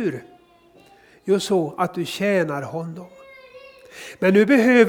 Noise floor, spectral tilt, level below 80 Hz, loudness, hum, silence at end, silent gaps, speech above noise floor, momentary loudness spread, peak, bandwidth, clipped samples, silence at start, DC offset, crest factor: -53 dBFS; -6 dB/octave; -66 dBFS; -20 LUFS; none; 0 s; none; 33 dB; 23 LU; -2 dBFS; 18.5 kHz; under 0.1%; 0 s; under 0.1%; 20 dB